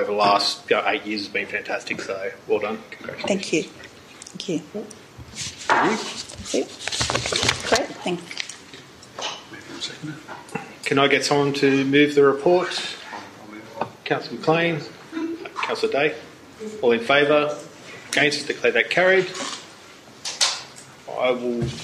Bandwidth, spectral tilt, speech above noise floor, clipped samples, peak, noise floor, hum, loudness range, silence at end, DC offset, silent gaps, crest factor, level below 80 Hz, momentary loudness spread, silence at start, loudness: 15 kHz; -3.5 dB/octave; 23 dB; under 0.1%; -2 dBFS; -45 dBFS; none; 7 LU; 0 s; under 0.1%; none; 22 dB; -56 dBFS; 20 LU; 0 s; -22 LUFS